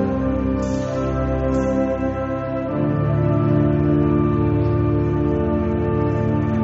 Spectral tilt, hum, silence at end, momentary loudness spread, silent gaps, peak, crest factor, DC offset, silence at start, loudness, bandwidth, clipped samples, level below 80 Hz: -9 dB/octave; none; 0 s; 5 LU; none; -6 dBFS; 12 dB; under 0.1%; 0 s; -20 LUFS; 7.8 kHz; under 0.1%; -32 dBFS